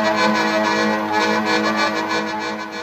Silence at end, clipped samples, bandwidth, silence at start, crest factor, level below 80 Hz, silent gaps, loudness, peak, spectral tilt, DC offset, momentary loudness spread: 0 s; under 0.1%; 15 kHz; 0 s; 14 dB; -64 dBFS; none; -18 LUFS; -4 dBFS; -3.5 dB/octave; under 0.1%; 6 LU